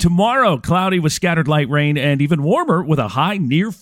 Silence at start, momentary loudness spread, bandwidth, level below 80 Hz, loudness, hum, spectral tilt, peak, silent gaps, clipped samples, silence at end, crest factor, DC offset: 0 s; 3 LU; 16 kHz; -40 dBFS; -16 LUFS; none; -6 dB/octave; -2 dBFS; none; under 0.1%; 0.05 s; 14 dB; under 0.1%